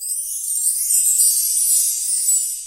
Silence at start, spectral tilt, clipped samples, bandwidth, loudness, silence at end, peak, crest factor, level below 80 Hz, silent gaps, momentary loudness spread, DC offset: 0 s; 8 dB/octave; under 0.1%; 17 kHz; -15 LUFS; 0 s; -2 dBFS; 16 dB; -58 dBFS; none; 8 LU; under 0.1%